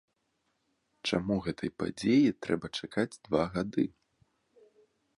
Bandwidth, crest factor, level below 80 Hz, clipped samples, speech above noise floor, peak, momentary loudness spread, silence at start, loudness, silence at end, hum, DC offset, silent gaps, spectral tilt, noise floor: 11.5 kHz; 20 dB; -60 dBFS; under 0.1%; 48 dB; -12 dBFS; 10 LU; 1.05 s; -31 LUFS; 1.3 s; none; under 0.1%; none; -6 dB/octave; -78 dBFS